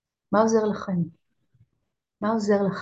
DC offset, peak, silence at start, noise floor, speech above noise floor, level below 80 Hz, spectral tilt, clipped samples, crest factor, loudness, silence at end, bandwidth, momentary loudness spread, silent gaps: under 0.1%; -6 dBFS; 0.3 s; -79 dBFS; 56 dB; -64 dBFS; -6.5 dB/octave; under 0.1%; 18 dB; -24 LUFS; 0 s; 8 kHz; 9 LU; none